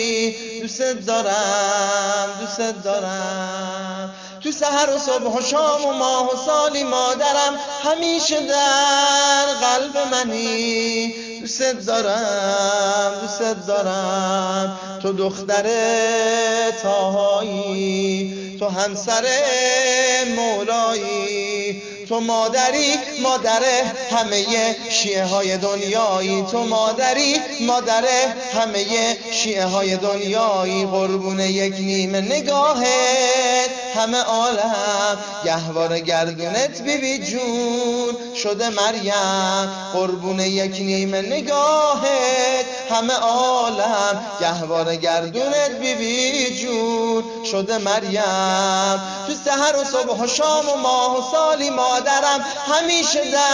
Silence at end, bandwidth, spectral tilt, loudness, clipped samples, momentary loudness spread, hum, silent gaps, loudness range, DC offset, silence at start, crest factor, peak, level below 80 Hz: 0 s; 10.5 kHz; -2.5 dB/octave; -19 LUFS; under 0.1%; 7 LU; none; none; 3 LU; under 0.1%; 0 s; 16 dB; -4 dBFS; -62 dBFS